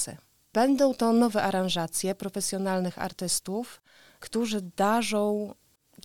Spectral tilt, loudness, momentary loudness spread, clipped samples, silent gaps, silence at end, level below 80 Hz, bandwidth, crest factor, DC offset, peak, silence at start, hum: -4 dB/octave; -27 LUFS; 11 LU; under 0.1%; none; 0.5 s; -64 dBFS; 18.5 kHz; 16 dB; 0.2%; -12 dBFS; 0 s; none